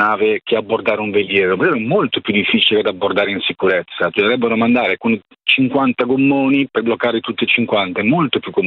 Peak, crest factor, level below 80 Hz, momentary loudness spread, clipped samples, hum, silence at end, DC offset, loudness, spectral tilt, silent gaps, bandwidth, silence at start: 0 dBFS; 16 dB; -58 dBFS; 5 LU; under 0.1%; none; 0 s; under 0.1%; -15 LUFS; -8 dB/octave; none; 4.7 kHz; 0 s